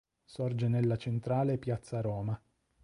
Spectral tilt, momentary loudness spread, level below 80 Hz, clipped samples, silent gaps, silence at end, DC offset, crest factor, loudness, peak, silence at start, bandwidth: -8.5 dB/octave; 8 LU; -60 dBFS; under 0.1%; none; 0.45 s; under 0.1%; 14 dB; -34 LUFS; -20 dBFS; 0.3 s; 11 kHz